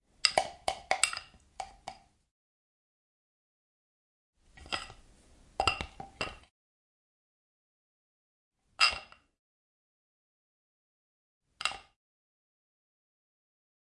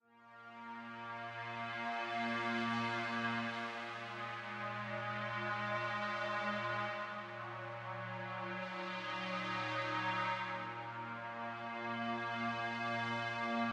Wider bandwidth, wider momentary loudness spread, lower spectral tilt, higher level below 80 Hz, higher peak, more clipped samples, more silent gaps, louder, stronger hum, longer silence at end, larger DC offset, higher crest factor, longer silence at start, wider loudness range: about the same, 11.5 kHz vs 10.5 kHz; first, 21 LU vs 8 LU; second, -0.5 dB/octave vs -5 dB/octave; first, -60 dBFS vs -82 dBFS; first, -4 dBFS vs -24 dBFS; neither; first, 2.31-4.33 s, 6.51-8.51 s, 9.39-11.41 s vs none; first, -32 LUFS vs -40 LUFS; neither; first, 2.15 s vs 0 s; neither; first, 36 dB vs 16 dB; first, 0.25 s vs 0.1 s; first, 12 LU vs 2 LU